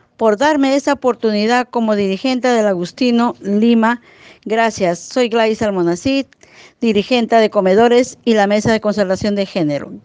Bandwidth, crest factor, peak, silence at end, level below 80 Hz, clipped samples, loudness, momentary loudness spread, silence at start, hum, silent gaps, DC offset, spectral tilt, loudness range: 9.6 kHz; 14 dB; 0 dBFS; 0.05 s; -52 dBFS; under 0.1%; -15 LUFS; 6 LU; 0.2 s; none; none; under 0.1%; -5 dB/octave; 2 LU